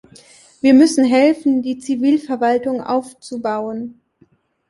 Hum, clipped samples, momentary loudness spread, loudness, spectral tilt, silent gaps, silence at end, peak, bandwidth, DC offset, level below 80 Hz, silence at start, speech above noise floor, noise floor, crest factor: none; under 0.1%; 15 LU; -16 LUFS; -4.5 dB/octave; none; 0.8 s; -2 dBFS; 11.5 kHz; under 0.1%; -62 dBFS; 0.65 s; 41 dB; -56 dBFS; 16 dB